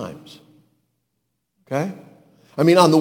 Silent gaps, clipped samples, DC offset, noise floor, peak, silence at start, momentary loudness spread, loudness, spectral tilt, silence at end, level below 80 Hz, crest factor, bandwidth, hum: none; under 0.1%; under 0.1%; -75 dBFS; 0 dBFS; 0 s; 26 LU; -19 LUFS; -6 dB/octave; 0 s; -64 dBFS; 22 dB; 17.5 kHz; none